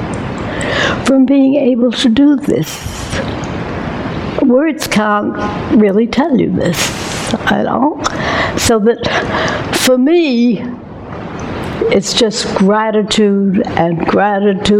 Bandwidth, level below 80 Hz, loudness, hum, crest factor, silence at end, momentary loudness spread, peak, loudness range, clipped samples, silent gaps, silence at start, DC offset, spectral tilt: 16.5 kHz; -36 dBFS; -13 LUFS; none; 12 dB; 0 s; 10 LU; 0 dBFS; 2 LU; under 0.1%; none; 0 s; under 0.1%; -5 dB/octave